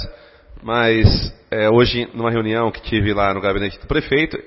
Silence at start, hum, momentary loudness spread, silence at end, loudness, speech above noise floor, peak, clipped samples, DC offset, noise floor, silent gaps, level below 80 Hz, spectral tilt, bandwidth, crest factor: 0 s; none; 9 LU; 0.05 s; -18 LUFS; 25 dB; 0 dBFS; under 0.1%; under 0.1%; -42 dBFS; none; -32 dBFS; -9.5 dB/octave; 5.8 kHz; 18 dB